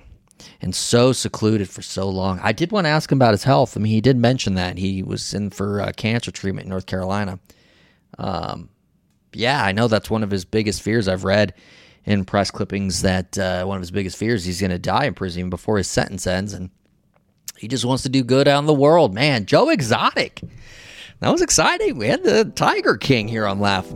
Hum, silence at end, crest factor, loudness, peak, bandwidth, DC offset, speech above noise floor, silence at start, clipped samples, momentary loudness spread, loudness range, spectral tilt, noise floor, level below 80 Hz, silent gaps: none; 0 s; 16 dB; -19 LUFS; -4 dBFS; 16.5 kHz; under 0.1%; 43 dB; 0.4 s; under 0.1%; 12 LU; 7 LU; -5 dB/octave; -62 dBFS; -46 dBFS; none